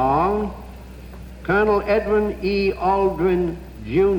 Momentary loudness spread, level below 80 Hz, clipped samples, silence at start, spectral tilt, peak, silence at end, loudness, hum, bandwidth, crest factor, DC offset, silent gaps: 21 LU; -36 dBFS; under 0.1%; 0 s; -8 dB/octave; -8 dBFS; 0 s; -20 LUFS; none; 17 kHz; 12 dB; under 0.1%; none